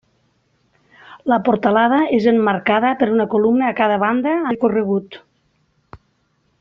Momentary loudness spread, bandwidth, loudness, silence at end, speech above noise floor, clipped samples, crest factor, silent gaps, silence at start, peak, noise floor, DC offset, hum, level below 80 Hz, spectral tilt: 5 LU; 6 kHz; -17 LUFS; 0.65 s; 48 dB; under 0.1%; 16 dB; none; 1.1 s; -2 dBFS; -64 dBFS; under 0.1%; none; -60 dBFS; -4.5 dB/octave